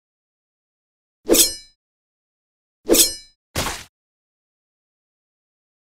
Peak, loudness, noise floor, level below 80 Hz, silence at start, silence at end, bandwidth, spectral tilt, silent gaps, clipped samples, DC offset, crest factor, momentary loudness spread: 0 dBFS; -17 LUFS; under -90 dBFS; -44 dBFS; 1.25 s; 2.15 s; 16 kHz; -1.5 dB/octave; 1.75-2.84 s, 3.35-3.54 s; under 0.1%; under 0.1%; 26 dB; 21 LU